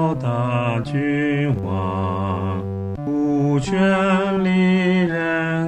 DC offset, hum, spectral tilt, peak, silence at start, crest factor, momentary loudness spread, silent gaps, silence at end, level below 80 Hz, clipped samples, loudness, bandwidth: 0.1%; none; -7.5 dB/octave; -6 dBFS; 0 s; 12 dB; 7 LU; none; 0 s; -48 dBFS; under 0.1%; -20 LUFS; 8.8 kHz